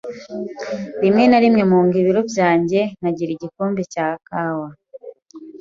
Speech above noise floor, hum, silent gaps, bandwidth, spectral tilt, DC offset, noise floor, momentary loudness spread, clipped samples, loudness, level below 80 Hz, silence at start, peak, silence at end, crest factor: 22 dB; none; none; 7.6 kHz; -7 dB/octave; under 0.1%; -39 dBFS; 15 LU; under 0.1%; -18 LUFS; -60 dBFS; 0.05 s; -2 dBFS; 0.05 s; 16 dB